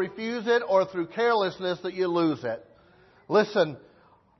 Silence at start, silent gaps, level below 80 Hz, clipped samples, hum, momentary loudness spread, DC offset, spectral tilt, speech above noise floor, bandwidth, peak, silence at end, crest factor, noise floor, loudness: 0 s; none; -70 dBFS; under 0.1%; none; 9 LU; under 0.1%; -6 dB/octave; 33 dB; 6.2 kHz; -10 dBFS; 0.6 s; 16 dB; -59 dBFS; -26 LUFS